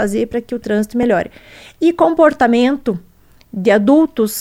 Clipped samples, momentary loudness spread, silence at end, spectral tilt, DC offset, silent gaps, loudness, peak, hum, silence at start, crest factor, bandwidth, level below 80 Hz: under 0.1%; 11 LU; 0 s; -5.5 dB/octave; under 0.1%; none; -15 LUFS; 0 dBFS; none; 0 s; 14 dB; 16 kHz; -46 dBFS